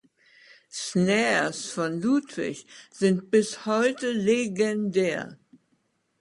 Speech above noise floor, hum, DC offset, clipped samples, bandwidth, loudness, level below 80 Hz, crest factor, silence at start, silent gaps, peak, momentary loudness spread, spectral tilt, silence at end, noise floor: 46 dB; none; under 0.1%; under 0.1%; 11.5 kHz; -25 LUFS; -70 dBFS; 18 dB; 0.75 s; none; -10 dBFS; 12 LU; -5 dB/octave; 0.85 s; -71 dBFS